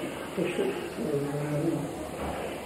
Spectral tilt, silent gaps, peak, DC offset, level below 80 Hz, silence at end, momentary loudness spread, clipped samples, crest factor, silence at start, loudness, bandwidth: -6 dB/octave; none; -16 dBFS; under 0.1%; -52 dBFS; 0 s; 5 LU; under 0.1%; 16 dB; 0 s; -32 LUFS; 16 kHz